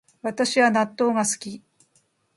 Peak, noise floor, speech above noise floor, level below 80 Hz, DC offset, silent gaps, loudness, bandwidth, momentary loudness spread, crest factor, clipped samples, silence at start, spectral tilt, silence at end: -6 dBFS; -66 dBFS; 44 dB; -72 dBFS; under 0.1%; none; -22 LUFS; 11.5 kHz; 16 LU; 18 dB; under 0.1%; 0.25 s; -3 dB/octave; 0.8 s